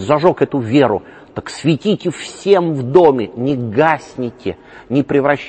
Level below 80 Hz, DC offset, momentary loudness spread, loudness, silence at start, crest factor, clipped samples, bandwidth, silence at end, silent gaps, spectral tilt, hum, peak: -52 dBFS; under 0.1%; 14 LU; -15 LUFS; 0 s; 16 dB; under 0.1%; 8.8 kHz; 0 s; none; -6.5 dB/octave; none; 0 dBFS